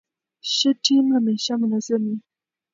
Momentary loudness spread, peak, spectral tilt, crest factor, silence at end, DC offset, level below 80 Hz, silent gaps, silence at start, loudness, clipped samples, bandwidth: 11 LU; -4 dBFS; -4 dB/octave; 18 dB; 0.55 s; under 0.1%; -78 dBFS; none; 0.45 s; -21 LUFS; under 0.1%; 7.6 kHz